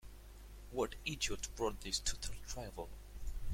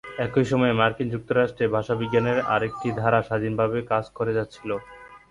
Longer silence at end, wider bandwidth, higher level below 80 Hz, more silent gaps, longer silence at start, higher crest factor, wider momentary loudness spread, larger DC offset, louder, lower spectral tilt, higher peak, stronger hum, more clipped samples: second, 0 s vs 0.15 s; first, 16.5 kHz vs 11 kHz; first, -48 dBFS vs -54 dBFS; neither; about the same, 0 s vs 0.05 s; about the same, 18 dB vs 18 dB; first, 18 LU vs 7 LU; neither; second, -42 LUFS vs -24 LUFS; second, -2.5 dB/octave vs -7.5 dB/octave; second, -22 dBFS vs -6 dBFS; first, 50 Hz at -50 dBFS vs none; neither